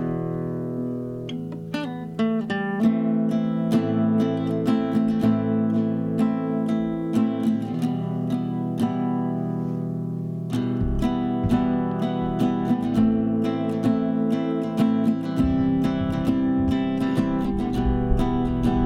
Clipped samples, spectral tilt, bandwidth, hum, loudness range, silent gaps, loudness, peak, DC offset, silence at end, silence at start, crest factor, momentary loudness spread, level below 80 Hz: under 0.1%; -8.5 dB/octave; 12 kHz; none; 3 LU; none; -24 LUFS; -8 dBFS; under 0.1%; 0 s; 0 s; 16 dB; 7 LU; -38 dBFS